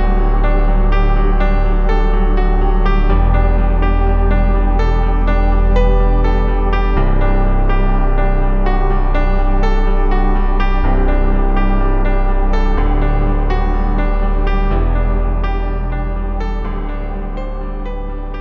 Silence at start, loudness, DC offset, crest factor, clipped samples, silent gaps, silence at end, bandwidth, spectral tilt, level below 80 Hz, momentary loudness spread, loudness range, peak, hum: 0 s; -17 LUFS; under 0.1%; 10 dB; under 0.1%; none; 0 s; 4.5 kHz; -9 dB/octave; -12 dBFS; 7 LU; 4 LU; -2 dBFS; none